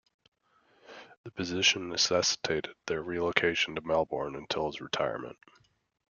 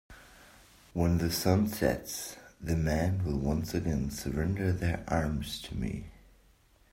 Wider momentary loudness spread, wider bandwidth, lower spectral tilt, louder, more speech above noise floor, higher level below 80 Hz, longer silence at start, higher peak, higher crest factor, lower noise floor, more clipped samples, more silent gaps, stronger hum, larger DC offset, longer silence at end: first, 17 LU vs 11 LU; second, 10 kHz vs 16 kHz; second, -2.5 dB/octave vs -6 dB/octave; about the same, -30 LUFS vs -31 LUFS; first, 37 dB vs 33 dB; second, -64 dBFS vs -44 dBFS; first, 0.9 s vs 0.1 s; first, -2 dBFS vs -10 dBFS; first, 30 dB vs 22 dB; first, -68 dBFS vs -63 dBFS; neither; first, 1.17-1.24 s vs none; neither; neither; about the same, 0.8 s vs 0.8 s